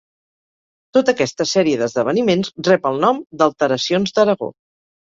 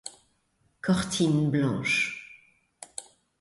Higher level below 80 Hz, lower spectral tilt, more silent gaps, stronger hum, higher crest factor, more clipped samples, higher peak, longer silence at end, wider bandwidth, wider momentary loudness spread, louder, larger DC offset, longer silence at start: about the same, -60 dBFS vs -58 dBFS; about the same, -5 dB/octave vs -5 dB/octave; first, 3.26-3.30 s vs none; neither; about the same, 16 dB vs 16 dB; neither; first, -2 dBFS vs -12 dBFS; about the same, 0.5 s vs 0.4 s; second, 7.8 kHz vs 11.5 kHz; second, 3 LU vs 19 LU; first, -17 LUFS vs -26 LUFS; neither; first, 0.95 s vs 0.05 s